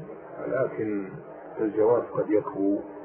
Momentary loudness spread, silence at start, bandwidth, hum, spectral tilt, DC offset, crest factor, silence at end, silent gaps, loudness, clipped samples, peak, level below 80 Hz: 16 LU; 0 s; 3.2 kHz; none; -12.5 dB/octave; under 0.1%; 16 dB; 0 s; none; -27 LUFS; under 0.1%; -10 dBFS; -66 dBFS